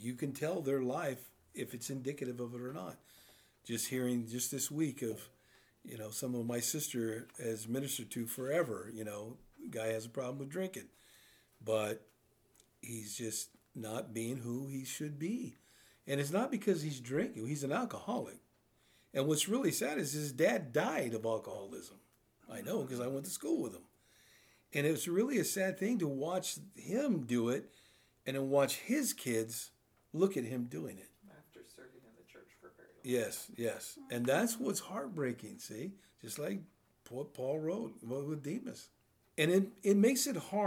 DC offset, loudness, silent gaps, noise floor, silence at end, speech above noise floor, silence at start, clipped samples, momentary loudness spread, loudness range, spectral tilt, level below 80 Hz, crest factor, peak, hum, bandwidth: under 0.1%; -37 LUFS; none; -72 dBFS; 0 s; 35 dB; 0 s; under 0.1%; 15 LU; 7 LU; -4.5 dB/octave; -80 dBFS; 20 dB; -18 dBFS; none; over 20 kHz